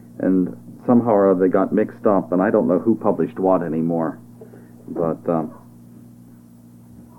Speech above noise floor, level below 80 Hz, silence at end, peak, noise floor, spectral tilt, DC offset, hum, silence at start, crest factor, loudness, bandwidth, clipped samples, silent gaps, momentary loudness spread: 27 dB; -62 dBFS; 0.15 s; -2 dBFS; -45 dBFS; -10.5 dB/octave; under 0.1%; 60 Hz at -50 dBFS; 0.2 s; 18 dB; -19 LUFS; 11.5 kHz; under 0.1%; none; 11 LU